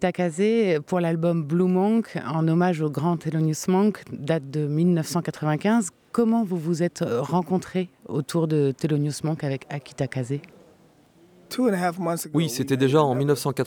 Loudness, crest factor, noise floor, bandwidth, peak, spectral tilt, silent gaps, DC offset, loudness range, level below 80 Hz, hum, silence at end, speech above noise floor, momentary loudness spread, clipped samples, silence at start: -24 LUFS; 18 dB; -56 dBFS; 19 kHz; -6 dBFS; -6.5 dB/octave; none; under 0.1%; 5 LU; -66 dBFS; none; 0 s; 33 dB; 8 LU; under 0.1%; 0 s